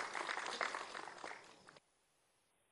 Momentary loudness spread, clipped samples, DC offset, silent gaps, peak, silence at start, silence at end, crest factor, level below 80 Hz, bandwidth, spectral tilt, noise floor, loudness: 20 LU; under 0.1%; under 0.1%; none; -22 dBFS; 0 s; 0.95 s; 24 dB; -88 dBFS; 12 kHz; -0.5 dB/octave; -79 dBFS; -44 LUFS